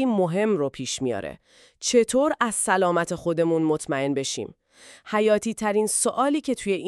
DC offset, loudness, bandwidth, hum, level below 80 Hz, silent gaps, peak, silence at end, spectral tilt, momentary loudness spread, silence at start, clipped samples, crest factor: under 0.1%; -23 LUFS; 13.5 kHz; none; -60 dBFS; none; -6 dBFS; 0 s; -4 dB/octave; 8 LU; 0 s; under 0.1%; 18 dB